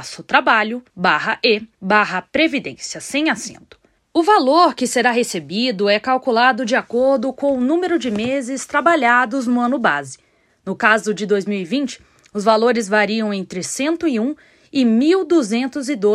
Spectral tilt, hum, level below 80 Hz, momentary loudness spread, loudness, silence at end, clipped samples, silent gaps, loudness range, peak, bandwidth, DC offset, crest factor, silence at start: -4 dB/octave; none; -60 dBFS; 10 LU; -17 LUFS; 0 s; under 0.1%; none; 3 LU; 0 dBFS; 13.5 kHz; under 0.1%; 18 dB; 0 s